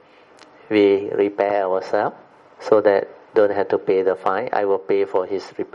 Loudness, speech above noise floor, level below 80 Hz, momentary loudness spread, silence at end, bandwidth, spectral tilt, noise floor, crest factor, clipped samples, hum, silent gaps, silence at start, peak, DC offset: -20 LUFS; 30 dB; -72 dBFS; 7 LU; 0.1 s; 7.2 kHz; -6.5 dB/octave; -48 dBFS; 18 dB; under 0.1%; none; none; 0.7 s; -2 dBFS; under 0.1%